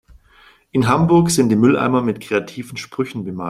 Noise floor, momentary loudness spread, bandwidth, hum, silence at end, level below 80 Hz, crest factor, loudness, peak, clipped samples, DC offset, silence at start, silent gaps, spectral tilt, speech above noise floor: -50 dBFS; 13 LU; 15 kHz; none; 0 s; -48 dBFS; 16 dB; -17 LUFS; -2 dBFS; under 0.1%; under 0.1%; 0.75 s; none; -6 dB/octave; 34 dB